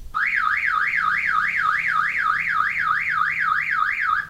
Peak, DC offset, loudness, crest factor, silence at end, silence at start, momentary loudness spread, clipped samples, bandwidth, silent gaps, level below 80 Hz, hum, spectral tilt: -8 dBFS; under 0.1%; -20 LUFS; 14 dB; 0 s; 0 s; 1 LU; under 0.1%; 16 kHz; none; -50 dBFS; none; -2 dB/octave